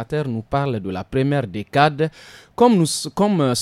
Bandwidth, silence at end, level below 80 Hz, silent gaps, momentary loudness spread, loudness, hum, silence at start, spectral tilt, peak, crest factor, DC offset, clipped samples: 15 kHz; 0 s; -50 dBFS; none; 9 LU; -20 LUFS; none; 0 s; -5.5 dB/octave; -2 dBFS; 18 dB; under 0.1%; under 0.1%